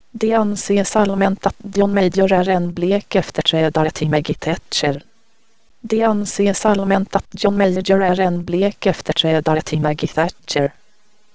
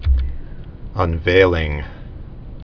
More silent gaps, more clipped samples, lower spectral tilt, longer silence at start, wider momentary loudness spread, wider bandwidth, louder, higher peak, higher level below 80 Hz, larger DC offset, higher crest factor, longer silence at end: neither; neither; second, -5.5 dB/octave vs -7.5 dB/octave; about the same, 0 s vs 0 s; second, 5 LU vs 23 LU; first, 8 kHz vs 5.4 kHz; about the same, -17 LUFS vs -18 LUFS; about the same, 0 dBFS vs 0 dBFS; second, -46 dBFS vs -24 dBFS; first, 1% vs under 0.1%; about the same, 18 dB vs 18 dB; about the same, 0 s vs 0.1 s